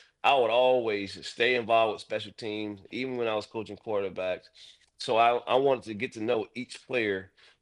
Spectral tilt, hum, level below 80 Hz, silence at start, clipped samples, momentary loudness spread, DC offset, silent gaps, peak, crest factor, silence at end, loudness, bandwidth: -4.5 dB/octave; none; -74 dBFS; 0.25 s; under 0.1%; 13 LU; under 0.1%; none; -10 dBFS; 18 dB; 0.35 s; -28 LUFS; 11 kHz